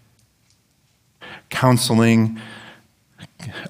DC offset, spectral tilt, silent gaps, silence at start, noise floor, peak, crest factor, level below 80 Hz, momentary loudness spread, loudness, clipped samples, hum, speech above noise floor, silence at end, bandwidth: under 0.1%; -5.5 dB/octave; none; 1.2 s; -62 dBFS; -2 dBFS; 20 dB; -62 dBFS; 24 LU; -17 LUFS; under 0.1%; none; 46 dB; 0 s; 16 kHz